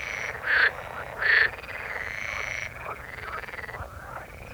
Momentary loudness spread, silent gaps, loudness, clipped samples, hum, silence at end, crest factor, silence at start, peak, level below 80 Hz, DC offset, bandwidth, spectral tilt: 17 LU; none; -27 LUFS; under 0.1%; none; 0 s; 20 dB; 0 s; -8 dBFS; -50 dBFS; under 0.1%; over 20 kHz; -2.5 dB/octave